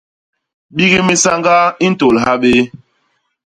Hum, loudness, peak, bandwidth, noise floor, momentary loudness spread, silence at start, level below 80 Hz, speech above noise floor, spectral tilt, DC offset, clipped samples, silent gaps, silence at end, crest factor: none; -11 LUFS; 0 dBFS; 11 kHz; -63 dBFS; 4 LU; 0.75 s; -46 dBFS; 52 dB; -4 dB/octave; under 0.1%; under 0.1%; none; 0.9 s; 14 dB